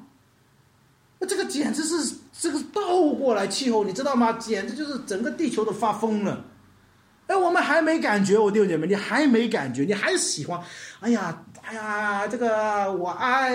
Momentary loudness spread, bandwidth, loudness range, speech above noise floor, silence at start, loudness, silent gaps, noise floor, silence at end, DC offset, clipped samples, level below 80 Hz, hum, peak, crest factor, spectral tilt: 10 LU; 16 kHz; 5 LU; 36 dB; 0 s; -24 LUFS; none; -60 dBFS; 0 s; under 0.1%; under 0.1%; -70 dBFS; none; -8 dBFS; 16 dB; -4 dB/octave